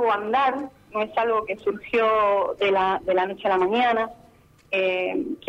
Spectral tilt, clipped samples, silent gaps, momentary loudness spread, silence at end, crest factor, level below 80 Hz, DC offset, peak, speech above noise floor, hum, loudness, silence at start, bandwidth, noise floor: -5.5 dB/octave; under 0.1%; none; 8 LU; 0.1 s; 14 dB; -60 dBFS; under 0.1%; -10 dBFS; 29 dB; none; -23 LUFS; 0 s; 8.6 kHz; -51 dBFS